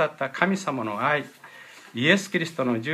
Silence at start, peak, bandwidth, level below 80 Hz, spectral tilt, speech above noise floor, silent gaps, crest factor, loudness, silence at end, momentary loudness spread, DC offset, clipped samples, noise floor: 0 s; -4 dBFS; 14.5 kHz; -74 dBFS; -5 dB/octave; 22 dB; none; 20 dB; -24 LUFS; 0 s; 22 LU; under 0.1%; under 0.1%; -46 dBFS